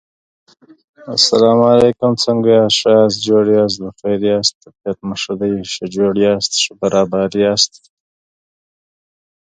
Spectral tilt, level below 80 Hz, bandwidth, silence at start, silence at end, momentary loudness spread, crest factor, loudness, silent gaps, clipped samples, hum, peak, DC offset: -4 dB/octave; -52 dBFS; 9.6 kHz; 1 s; 1.75 s; 11 LU; 16 dB; -14 LUFS; 4.55-4.61 s; under 0.1%; none; 0 dBFS; under 0.1%